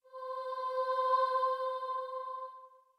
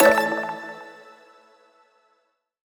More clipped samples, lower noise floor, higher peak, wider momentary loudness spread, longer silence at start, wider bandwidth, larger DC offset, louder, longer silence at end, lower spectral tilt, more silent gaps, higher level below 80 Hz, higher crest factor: neither; second, -55 dBFS vs -70 dBFS; second, -20 dBFS vs -2 dBFS; second, 13 LU vs 25 LU; about the same, 0.1 s vs 0 s; second, 11 kHz vs over 20 kHz; neither; second, -34 LUFS vs -23 LUFS; second, 0.3 s vs 1.85 s; second, 0 dB/octave vs -3.5 dB/octave; neither; second, under -90 dBFS vs -66 dBFS; second, 14 dB vs 24 dB